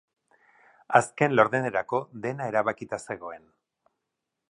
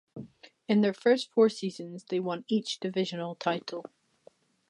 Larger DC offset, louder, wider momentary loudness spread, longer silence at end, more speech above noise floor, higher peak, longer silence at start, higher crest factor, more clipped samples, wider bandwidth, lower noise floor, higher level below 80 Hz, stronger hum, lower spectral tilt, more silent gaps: neither; first, -26 LUFS vs -29 LUFS; second, 15 LU vs 18 LU; first, 1.15 s vs 0.85 s; first, 58 dB vs 32 dB; first, -4 dBFS vs -12 dBFS; first, 0.9 s vs 0.15 s; first, 26 dB vs 18 dB; neither; about the same, 11.5 kHz vs 11 kHz; first, -84 dBFS vs -61 dBFS; first, -70 dBFS vs -80 dBFS; neither; about the same, -5.5 dB/octave vs -5.5 dB/octave; neither